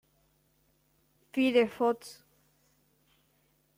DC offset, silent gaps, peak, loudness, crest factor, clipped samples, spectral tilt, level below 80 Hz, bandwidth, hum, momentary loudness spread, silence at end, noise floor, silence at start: under 0.1%; none; -12 dBFS; -29 LUFS; 22 dB; under 0.1%; -4.5 dB/octave; -76 dBFS; 16 kHz; none; 12 LU; 1.65 s; -71 dBFS; 1.35 s